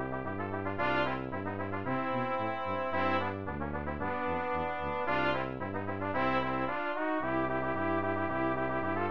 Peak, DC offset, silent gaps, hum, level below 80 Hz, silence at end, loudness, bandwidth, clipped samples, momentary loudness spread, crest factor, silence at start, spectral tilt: -16 dBFS; 0.6%; none; none; -54 dBFS; 0 s; -33 LUFS; 6.6 kHz; under 0.1%; 6 LU; 16 dB; 0 s; -8 dB/octave